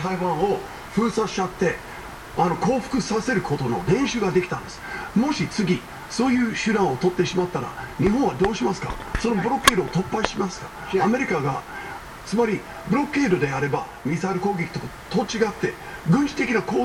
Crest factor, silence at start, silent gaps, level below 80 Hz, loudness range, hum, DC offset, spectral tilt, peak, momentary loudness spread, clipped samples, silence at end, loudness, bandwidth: 24 dB; 0 s; none; -44 dBFS; 2 LU; none; under 0.1%; -5.5 dB/octave; 0 dBFS; 9 LU; under 0.1%; 0 s; -23 LUFS; 17 kHz